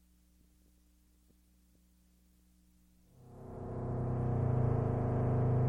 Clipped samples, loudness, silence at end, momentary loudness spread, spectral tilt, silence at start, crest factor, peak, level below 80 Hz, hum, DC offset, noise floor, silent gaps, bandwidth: under 0.1%; -34 LUFS; 0 s; 18 LU; -11 dB/octave; 3.2 s; 16 dB; -20 dBFS; -50 dBFS; 60 Hz at -70 dBFS; under 0.1%; -67 dBFS; none; 2.8 kHz